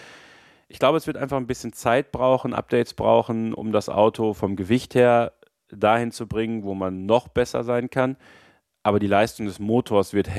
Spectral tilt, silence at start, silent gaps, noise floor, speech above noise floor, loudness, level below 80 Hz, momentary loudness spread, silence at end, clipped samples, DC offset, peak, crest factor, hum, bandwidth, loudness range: -6 dB/octave; 0 s; none; -52 dBFS; 30 dB; -22 LUFS; -52 dBFS; 8 LU; 0 s; under 0.1%; under 0.1%; -4 dBFS; 18 dB; none; 14.5 kHz; 3 LU